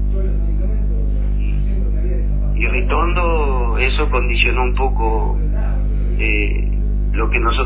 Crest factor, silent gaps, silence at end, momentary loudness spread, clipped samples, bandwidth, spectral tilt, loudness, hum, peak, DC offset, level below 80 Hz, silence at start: 14 dB; none; 0 s; 5 LU; under 0.1%; 4 kHz; -10 dB/octave; -19 LUFS; 50 Hz at -15 dBFS; -2 dBFS; under 0.1%; -16 dBFS; 0 s